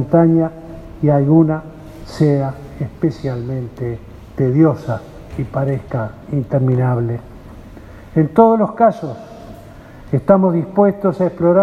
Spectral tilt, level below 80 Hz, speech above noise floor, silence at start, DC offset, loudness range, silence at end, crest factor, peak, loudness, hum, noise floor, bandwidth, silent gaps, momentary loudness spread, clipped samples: -10 dB/octave; -42 dBFS; 22 dB; 0 s; under 0.1%; 5 LU; 0 s; 16 dB; 0 dBFS; -16 LUFS; none; -37 dBFS; 8.4 kHz; none; 19 LU; under 0.1%